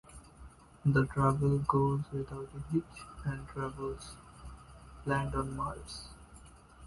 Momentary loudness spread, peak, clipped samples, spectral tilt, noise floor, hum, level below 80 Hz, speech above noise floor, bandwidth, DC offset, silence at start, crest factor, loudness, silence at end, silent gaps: 23 LU; -14 dBFS; under 0.1%; -7.5 dB/octave; -55 dBFS; none; -50 dBFS; 22 dB; 11.5 kHz; under 0.1%; 0.1 s; 22 dB; -34 LUFS; 0 s; none